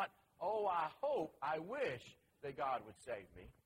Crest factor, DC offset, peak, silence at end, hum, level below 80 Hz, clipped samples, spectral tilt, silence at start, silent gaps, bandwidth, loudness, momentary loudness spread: 16 dB; under 0.1%; -26 dBFS; 0.15 s; none; -74 dBFS; under 0.1%; -5.5 dB/octave; 0 s; none; 16 kHz; -43 LUFS; 12 LU